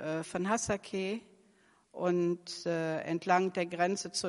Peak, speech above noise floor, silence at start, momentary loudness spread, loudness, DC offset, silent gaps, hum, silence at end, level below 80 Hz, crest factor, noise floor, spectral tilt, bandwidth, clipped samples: -12 dBFS; 34 dB; 0 s; 7 LU; -33 LUFS; under 0.1%; none; none; 0 s; -68 dBFS; 20 dB; -67 dBFS; -4.5 dB/octave; 11.5 kHz; under 0.1%